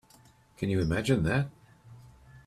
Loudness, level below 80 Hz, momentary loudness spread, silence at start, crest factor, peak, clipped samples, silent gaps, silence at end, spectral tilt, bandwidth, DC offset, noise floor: -29 LUFS; -50 dBFS; 9 LU; 0.6 s; 20 dB; -12 dBFS; under 0.1%; none; 0.05 s; -6.5 dB/octave; 13.5 kHz; under 0.1%; -59 dBFS